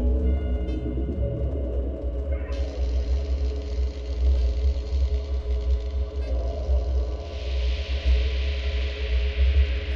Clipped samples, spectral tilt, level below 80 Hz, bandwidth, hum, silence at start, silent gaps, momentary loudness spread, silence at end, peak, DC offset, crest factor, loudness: under 0.1%; -7.5 dB/octave; -24 dBFS; 6.4 kHz; none; 0 s; none; 6 LU; 0 s; -12 dBFS; under 0.1%; 12 dB; -27 LUFS